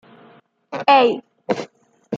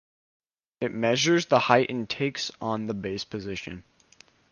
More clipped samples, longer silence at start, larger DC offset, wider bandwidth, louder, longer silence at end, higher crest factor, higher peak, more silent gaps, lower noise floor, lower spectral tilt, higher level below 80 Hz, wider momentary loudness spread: neither; about the same, 0.7 s vs 0.8 s; neither; second, 7.6 kHz vs 10 kHz; first, -18 LUFS vs -26 LUFS; second, 0 s vs 0.7 s; about the same, 20 dB vs 24 dB; about the same, -2 dBFS vs -4 dBFS; neither; second, -51 dBFS vs -58 dBFS; about the same, -5 dB/octave vs -4.5 dB/octave; second, -74 dBFS vs -60 dBFS; first, 18 LU vs 14 LU